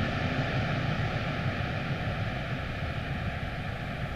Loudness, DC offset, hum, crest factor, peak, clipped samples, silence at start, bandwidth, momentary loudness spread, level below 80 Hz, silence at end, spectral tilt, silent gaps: -32 LUFS; under 0.1%; none; 16 dB; -16 dBFS; under 0.1%; 0 s; 13 kHz; 5 LU; -42 dBFS; 0 s; -7 dB/octave; none